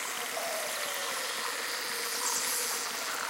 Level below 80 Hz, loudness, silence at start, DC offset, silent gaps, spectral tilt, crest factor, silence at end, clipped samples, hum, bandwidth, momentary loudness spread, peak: -80 dBFS; -31 LUFS; 0 s; under 0.1%; none; 1.5 dB/octave; 16 dB; 0 s; under 0.1%; none; 17 kHz; 4 LU; -18 dBFS